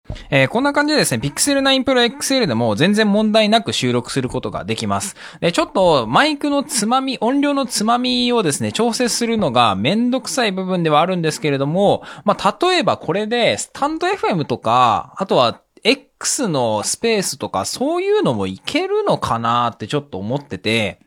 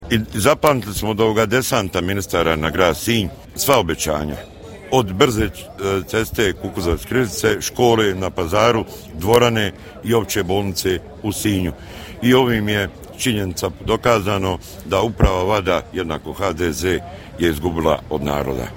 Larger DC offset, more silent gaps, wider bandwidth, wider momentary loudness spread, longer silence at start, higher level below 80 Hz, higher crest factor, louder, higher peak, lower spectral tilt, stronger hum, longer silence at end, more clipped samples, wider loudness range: neither; neither; about the same, 17.5 kHz vs 17 kHz; about the same, 7 LU vs 9 LU; about the same, 0.1 s vs 0 s; second, -50 dBFS vs -34 dBFS; about the same, 18 dB vs 18 dB; about the same, -17 LUFS vs -19 LUFS; about the same, 0 dBFS vs 0 dBFS; about the same, -4 dB/octave vs -4.5 dB/octave; neither; about the same, 0.1 s vs 0 s; neither; about the same, 3 LU vs 2 LU